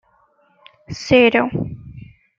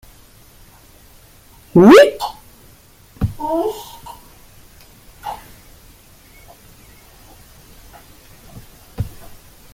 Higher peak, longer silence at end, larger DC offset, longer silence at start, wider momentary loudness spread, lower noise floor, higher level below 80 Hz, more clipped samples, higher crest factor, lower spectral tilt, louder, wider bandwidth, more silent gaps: about the same, -2 dBFS vs 0 dBFS; second, 0.35 s vs 0.65 s; neither; second, 0.9 s vs 1.75 s; second, 21 LU vs 28 LU; first, -58 dBFS vs -47 dBFS; second, -48 dBFS vs -42 dBFS; neither; about the same, 18 dB vs 20 dB; about the same, -5.5 dB/octave vs -6 dB/octave; about the same, -16 LUFS vs -14 LUFS; second, 7.6 kHz vs 17 kHz; neither